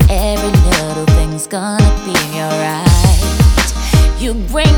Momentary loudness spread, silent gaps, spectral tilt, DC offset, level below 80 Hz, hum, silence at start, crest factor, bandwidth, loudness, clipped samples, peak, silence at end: 7 LU; none; -5 dB/octave; under 0.1%; -14 dBFS; none; 0 s; 10 dB; over 20 kHz; -13 LUFS; under 0.1%; 0 dBFS; 0 s